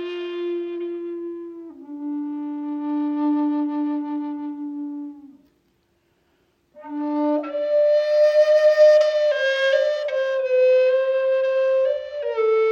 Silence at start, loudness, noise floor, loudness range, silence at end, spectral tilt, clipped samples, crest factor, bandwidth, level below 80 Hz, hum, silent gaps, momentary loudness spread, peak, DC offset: 0 s; -21 LUFS; -66 dBFS; 12 LU; 0 s; -3.5 dB/octave; under 0.1%; 16 dB; 7.2 kHz; -72 dBFS; none; none; 16 LU; -6 dBFS; under 0.1%